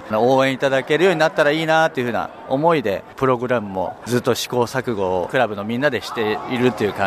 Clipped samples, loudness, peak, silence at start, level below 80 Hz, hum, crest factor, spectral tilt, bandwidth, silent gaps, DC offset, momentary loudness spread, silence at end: under 0.1%; -19 LUFS; -2 dBFS; 0 s; -56 dBFS; none; 16 dB; -5 dB/octave; 15.5 kHz; none; under 0.1%; 6 LU; 0 s